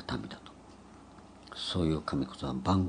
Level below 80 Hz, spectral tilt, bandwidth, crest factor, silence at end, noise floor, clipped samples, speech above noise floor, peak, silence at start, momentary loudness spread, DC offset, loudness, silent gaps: -54 dBFS; -6.5 dB/octave; 10 kHz; 20 dB; 0 s; -53 dBFS; under 0.1%; 22 dB; -14 dBFS; 0 s; 23 LU; under 0.1%; -34 LUFS; none